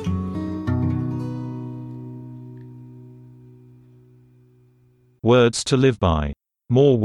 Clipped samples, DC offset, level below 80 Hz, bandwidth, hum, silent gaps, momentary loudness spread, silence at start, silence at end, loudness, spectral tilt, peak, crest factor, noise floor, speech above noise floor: under 0.1%; under 0.1%; -40 dBFS; 11.5 kHz; none; none; 24 LU; 0 s; 0 s; -21 LUFS; -6.5 dB/octave; -6 dBFS; 18 dB; -58 dBFS; 41 dB